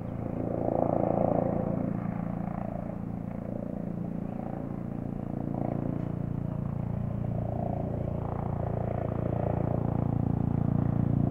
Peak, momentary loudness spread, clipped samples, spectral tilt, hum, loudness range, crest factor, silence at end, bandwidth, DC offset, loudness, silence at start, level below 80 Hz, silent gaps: -10 dBFS; 8 LU; under 0.1%; -11.5 dB/octave; none; 5 LU; 20 dB; 0 s; 3.4 kHz; under 0.1%; -32 LUFS; 0 s; -46 dBFS; none